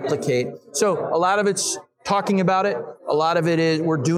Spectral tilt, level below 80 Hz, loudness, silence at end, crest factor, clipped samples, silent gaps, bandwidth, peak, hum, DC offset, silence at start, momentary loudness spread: -4.5 dB/octave; -66 dBFS; -21 LUFS; 0 s; 14 dB; under 0.1%; none; 15.5 kHz; -6 dBFS; none; under 0.1%; 0 s; 6 LU